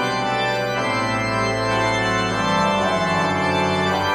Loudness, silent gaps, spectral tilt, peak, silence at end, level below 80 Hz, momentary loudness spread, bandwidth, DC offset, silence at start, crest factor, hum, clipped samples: -20 LUFS; none; -4.5 dB/octave; -6 dBFS; 0 s; -44 dBFS; 2 LU; 13.5 kHz; under 0.1%; 0 s; 14 dB; none; under 0.1%